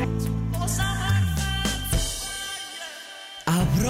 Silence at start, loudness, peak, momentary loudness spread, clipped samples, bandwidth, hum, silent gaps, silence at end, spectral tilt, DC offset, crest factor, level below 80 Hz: 0 s; -26 LUFS; -14 dBFS; 11 LU; under 0.1%; 16 kHz; none; none; 0 s; -4 dB/octave; under 0.1%; 12 dB; -34 dBFS